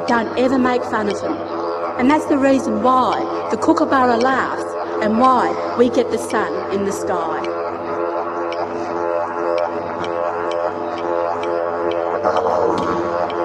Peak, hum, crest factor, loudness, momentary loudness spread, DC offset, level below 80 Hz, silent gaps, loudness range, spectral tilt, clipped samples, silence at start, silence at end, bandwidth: -2 dBFS; none; 16 dB; -19 LUFS; 8 LU; under 0.1%; -56 dBFS; none; 5 LU; -5.5 dB/octave; under 0.1%; 0 s; 0 s; 12.5 kHz